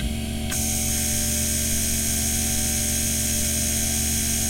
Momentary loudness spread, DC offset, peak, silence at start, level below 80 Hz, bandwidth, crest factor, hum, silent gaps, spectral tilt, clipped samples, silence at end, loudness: 2 LU; under 0.1%; -10 dBFS; 0 s; -32 dBFS; 16.5 kHz; 14 dB; 60 Hz at -40 dBFS; none; -2.5 dB/octave; under 0.1%; 0 s; -22 LUFS